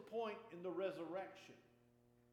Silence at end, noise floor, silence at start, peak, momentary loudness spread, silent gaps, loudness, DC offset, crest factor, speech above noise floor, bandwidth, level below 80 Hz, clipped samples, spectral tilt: 0.65 s; -73 dBFS; 0 s; -32 dBFS; 17 LU; none; -48 LUFS; under 0.1%; 16 dB; 25 dB; 16 kHz; -90 dBFS; under 0.1%; -6 dB/octave